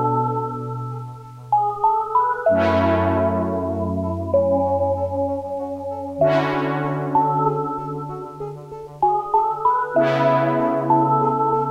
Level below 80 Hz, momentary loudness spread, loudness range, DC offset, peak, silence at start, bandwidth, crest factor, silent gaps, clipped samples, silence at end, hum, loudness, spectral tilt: -52 dBFS; 12 LU; 3 LU; under 0.1%; -4 dBFS; 0 s; 10 kHz; 16 dB; none; under 0.1%; 0 s; none; -20 LUFS; -8.5 dB/octave